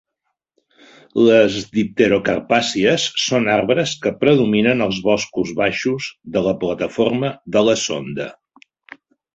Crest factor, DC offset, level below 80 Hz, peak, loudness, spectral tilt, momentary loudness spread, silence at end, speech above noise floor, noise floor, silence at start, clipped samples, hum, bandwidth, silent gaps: 16 dB; under 0.1%; -54 dBFS; -2 dBFS; -17 LUFS; -4.5 dB/octave; 8 LU; 1 s; 59 dB; -76 dBFS; 1.15 s; under 0.1%; none; 8.2 kHz; none